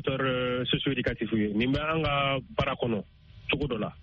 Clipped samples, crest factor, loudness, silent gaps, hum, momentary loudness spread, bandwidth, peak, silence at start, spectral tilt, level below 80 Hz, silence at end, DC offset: under 0.1%; 16 dB; -28 LUFS; none; none; 5 LU; 7 kHz; -12 dBFS; 0 s; -4 dB/octave; -48 dBFS; 0 s; under 0.1%